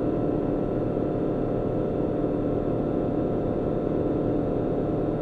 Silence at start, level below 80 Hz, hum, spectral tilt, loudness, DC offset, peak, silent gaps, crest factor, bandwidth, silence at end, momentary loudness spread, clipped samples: 0 s; -40 dBFS; none; -11 dB/octave; -26 LUFS; under 0.1%; -12 dBFS; none; 12 dB; 4.7 kHz; 0 s; 1 LU; under 0.1%